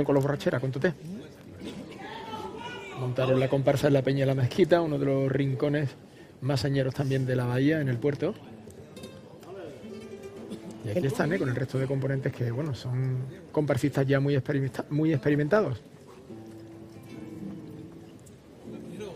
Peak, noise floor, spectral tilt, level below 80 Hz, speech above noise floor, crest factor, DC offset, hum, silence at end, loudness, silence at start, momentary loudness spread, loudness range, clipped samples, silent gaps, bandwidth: -8 dBFS; -49 dBFS; -7.5 dB/octave; -60 dBFS; 23 dB; 20 dB; under 0.1%; none; 0 s; -28 LUFS; 0 s; 20 LU; 8 LU; under 0.1%; none; 15 kHz